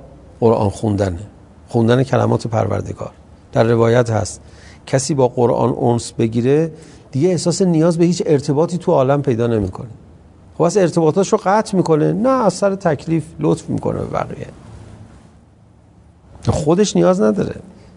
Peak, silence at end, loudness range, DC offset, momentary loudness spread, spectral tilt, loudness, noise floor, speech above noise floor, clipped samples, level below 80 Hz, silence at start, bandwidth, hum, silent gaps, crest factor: 0 dBFS; 0.25 s; 5 LU; under 0.1%; 11 LU; -6.5 dB/octave; -16 LUFS; -47 dBFS; 32 dB; under 0.1%; -46 dBFS; 0 s; 11 kHz; none; none; 16 dB